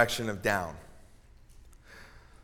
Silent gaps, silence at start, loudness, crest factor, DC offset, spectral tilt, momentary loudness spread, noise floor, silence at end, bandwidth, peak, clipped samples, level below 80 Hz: none; 0 s; -31 LUFS; 26 dB; under 0.1%; -4 dB/octave; 24 LU; -55 dBFS; 0.25 s; 18.5 kHz; -8 dBFS; under 0.1%; -54 dBFS